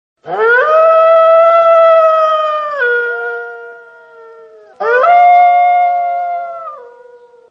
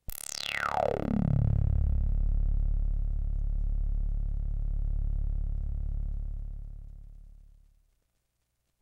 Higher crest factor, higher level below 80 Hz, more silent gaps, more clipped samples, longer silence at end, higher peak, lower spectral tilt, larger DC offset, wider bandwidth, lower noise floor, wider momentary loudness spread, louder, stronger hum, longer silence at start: second, 10 dB vs 16 dB; second, -70 dBFS vs -30 dBFS; neither; neither; second, 0.65 s vs 1.35 s; first, 0 dBFS vs -14 dBFS; second, -3 dB/octave vs -6 dB/octave; neither; second, 6 kHz vs 16 kHz; second, -40 dBFS vs -78 dBFS; first, 16 LU vs 13 LU; first, -9 LUFS vs -33 LUFS; neither; first, 0.25 s vs 0.1 s